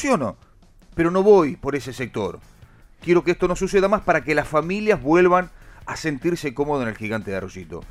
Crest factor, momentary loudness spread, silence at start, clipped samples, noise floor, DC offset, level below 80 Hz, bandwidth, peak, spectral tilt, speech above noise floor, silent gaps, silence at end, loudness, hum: 18 dB; 15 LU; 0 s; under 0.1%; -50 dBFS; under 0.1%; -44 dBFS; 13.5 kHz; -4 dBFS; -6 dB/octave; 29 dB; none; 0.05 s; -21 LUFS; none